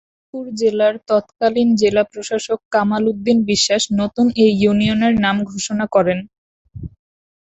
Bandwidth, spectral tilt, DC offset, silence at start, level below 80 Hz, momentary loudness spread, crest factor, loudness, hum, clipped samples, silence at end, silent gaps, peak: 8.2 kHz; -4.5 dB/octave; under 0.1%; 0.35 s; -48 dBFS; 13 LU; 16 dB; -17 LUFS; none; under 0.1%; 0.6 s; 2.65-2.71 s, 6.38-6.65 s; -2 dBFS